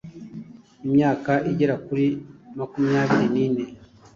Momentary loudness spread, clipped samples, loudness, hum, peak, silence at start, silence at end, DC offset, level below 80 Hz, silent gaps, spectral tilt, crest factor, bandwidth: 19 LU; under 0.1%; -22 LUFS; none; -8 dBFS; 0.05 s; 0.3 s; under 0.1%; -58 dBFS; none; -8 dB/octave; 16 dB; 7.2 kHz